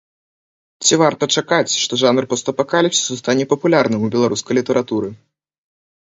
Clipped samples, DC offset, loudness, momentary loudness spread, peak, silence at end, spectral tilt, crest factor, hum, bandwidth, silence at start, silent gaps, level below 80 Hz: under 0.1%; under 0.1%; -16 LUFS; 5 LU; 0 dBFS; 1 s; -3.5 dB/octave; 18 dB; none; 8 kHz; 0.8 s; none; -60 dBFS